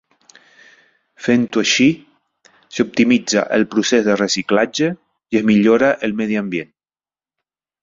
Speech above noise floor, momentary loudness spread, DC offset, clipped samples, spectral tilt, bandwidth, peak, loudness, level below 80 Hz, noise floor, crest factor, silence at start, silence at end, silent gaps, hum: over 74 dB; 11 LU; under 0.1%; under 0.1%; -4 dB/octave; 7.8 kHz; -2 dBFS; -16 LUFS; -58 dBFS; under -90 dBFS; 16 dB; 1.2 s; 1.2 s; none; none